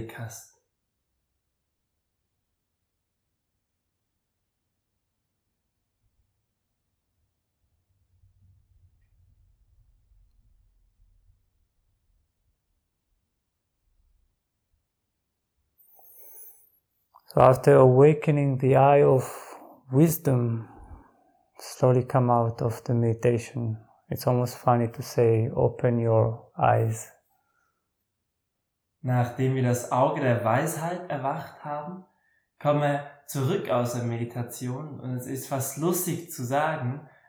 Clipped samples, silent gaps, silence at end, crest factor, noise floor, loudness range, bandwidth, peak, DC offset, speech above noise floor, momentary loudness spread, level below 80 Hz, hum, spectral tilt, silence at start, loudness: under 0.1%; none; 0.25 s; 24 dB; -80 dBFS; 9 LU; over 20 kHz; -4 dBFS; under 0.1%; 56 dB; 19 LU; -62 dBFS; none; -7 dB/octave; 0 s; -24 LUFS